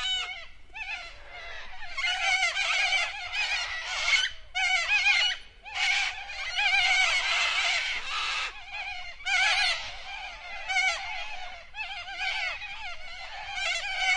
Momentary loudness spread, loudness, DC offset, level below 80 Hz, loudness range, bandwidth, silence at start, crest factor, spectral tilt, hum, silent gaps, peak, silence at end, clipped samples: 16 LU; -26 LUFS; under 0.1%; -52 dBFS; 7 LU; 11.5 kHz; 0 s; 18 dB; 2 dB/octave; none; none; -12 dBFS; 0 s; under 0.1%